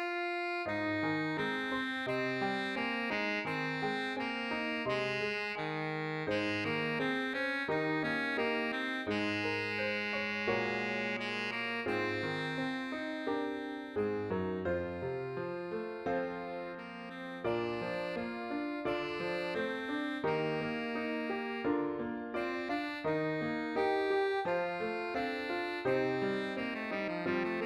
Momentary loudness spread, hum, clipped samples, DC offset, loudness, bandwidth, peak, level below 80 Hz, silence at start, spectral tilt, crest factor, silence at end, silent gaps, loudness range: 6 LU; none; under 0.1%; under 0.1%; -35 LUFS; 13.5 kHz; -20 dBFS; -68 dBFS; 0 s; -6 dB/octave; 14 dB; 0 s; none; 4 LU